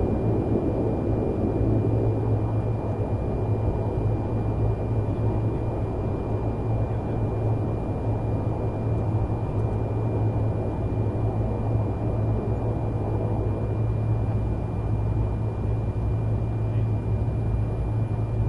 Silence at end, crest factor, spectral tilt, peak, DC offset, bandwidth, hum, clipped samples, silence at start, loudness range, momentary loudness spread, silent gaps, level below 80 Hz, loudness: 0 s; 14 dB; -10.5 dB/octave; -10 dBFS; under 0.1%; 3.6 kHz; none; under 0.1%; 0 s; 1 LU; 3 LU; none; -32 dBFS; -26 LUFS